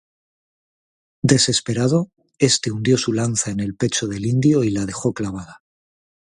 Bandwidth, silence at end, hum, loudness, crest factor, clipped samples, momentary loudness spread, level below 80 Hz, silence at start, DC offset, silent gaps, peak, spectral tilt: 11.5 kHz; 0.85 s; none; -19 LUFS; 20 dB; under 0.1%; 8 LU; -50 dBFS; 1.25 s; under 0.1%; none; 0 dBFS; -4.5 dB/octave